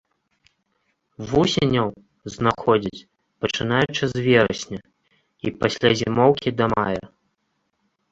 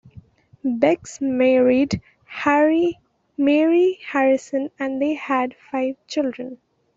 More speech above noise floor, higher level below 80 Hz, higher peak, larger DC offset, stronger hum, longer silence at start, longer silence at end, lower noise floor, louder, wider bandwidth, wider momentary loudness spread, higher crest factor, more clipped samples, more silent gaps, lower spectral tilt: first, 52 dB vs 28 dB; first, -50 dBFS vs -60 dBFS; about the same, -2 dBFS vs -4 dBFS; neither; neither; first, 1.2 s vs 0.65 s; first, 1.05 s vs 0.4 s; first, -72 dBFS vs -47 dBFS; about the same, -21 LUFS vs -20 LUFS; about the same, 8 kHz vs 7.8 kHz; about the same, 14 LU vs 12 LU; about the same, 22 dB vs 18 dB; neither; neither; about the same, -5.5 dB/octave vs -5.5 dB/octave